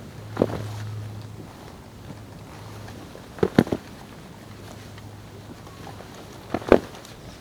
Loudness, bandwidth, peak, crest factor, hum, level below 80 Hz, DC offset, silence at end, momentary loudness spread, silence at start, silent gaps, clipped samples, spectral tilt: -25 LUFS; over 20 kHz; 0 dBFS; 28 dB; none; -50 dBFS; under 0.1%; 0 s; 21 LU; 0 s; none; under 0.1%; -6.5 dB/octave